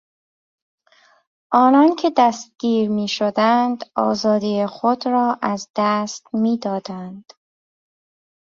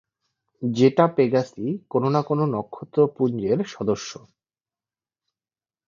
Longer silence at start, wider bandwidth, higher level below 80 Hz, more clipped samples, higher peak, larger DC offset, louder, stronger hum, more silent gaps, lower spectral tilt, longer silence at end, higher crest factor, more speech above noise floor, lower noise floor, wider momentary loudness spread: first, 1.5 s vs 0.6 s; about the same, 7.6 kHz vs 7.4 kHz; about the same, -66 dBFS vs -64 dBFS; neither; about the same, -2 dBFS vs -2 dBFS; neither; first, -19 LUFS vs -23 LUFS; neither; first, 5.70-5.74 s vs none; second, -5.5 dB/octave vs -7 dB/octave; second, 1.25 s vs 1.7 s; about the same, 18 dB vs 22 dB; second, 38 dB vs over 68 dB; second, -56 dBFS vs under -90 dBFS; about the same, 11 LU vs 10 LU